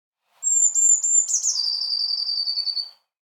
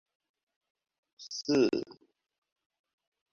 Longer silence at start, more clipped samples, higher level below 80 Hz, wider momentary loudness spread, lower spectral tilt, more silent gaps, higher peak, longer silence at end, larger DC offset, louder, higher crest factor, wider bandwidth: second, 0.4 s vs 1.2 s; neither; second, under -90 dBFS vs -74 dBFS; second, 11 LU vs 21 LU; second, 8.5 dB/octave vs -4.5 dB/octave; neither; first, -6 dBFS vs -16 dBFS; second, 0.4 s vs 1.4 s; neither; first, -19 LUFS vs -30 LUFS; about the same, 16 dB vs 20 dB; first, 19 kHz vs 7.6 kHz